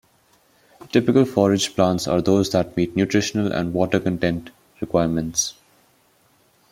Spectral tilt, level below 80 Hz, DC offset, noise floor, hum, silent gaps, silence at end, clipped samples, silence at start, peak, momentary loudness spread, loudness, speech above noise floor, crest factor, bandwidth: -5 dB/octave; -52 dBFS; under 0.1%; -60 dBFS; none; none; 1.2 s; under 0.1%; 0.95 s; -2 dBFS; 6 LU; -21 LUFS; 40 dB; 20 dB; 16.5 kHz